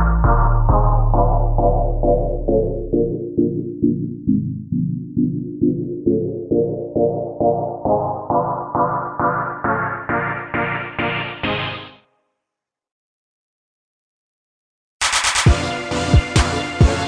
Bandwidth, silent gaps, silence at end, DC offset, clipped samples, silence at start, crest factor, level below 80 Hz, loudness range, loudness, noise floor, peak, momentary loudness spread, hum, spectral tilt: 10.5 kHz; 12.92-15.00 s; 0 s; under 0.1%; under 0.1%; 0 s; 16 dB; -24 dBFS; 7 LU; -19 LUFS; -84 dBFS; -2 dBFS; 6 LU; none; -5.5 dB/octave